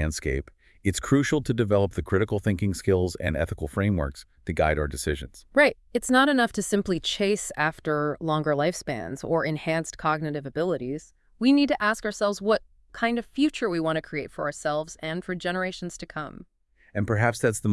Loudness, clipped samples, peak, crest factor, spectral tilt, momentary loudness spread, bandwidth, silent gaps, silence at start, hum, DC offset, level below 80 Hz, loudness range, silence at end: -26 LUFS; under 0.1%; -8 dBFS; 18 dB; -5 dB/octave; 11 LU; 12 kHz; none; 0 s; none; under 0.1%; -44 dBFS; 5 LU; 0 s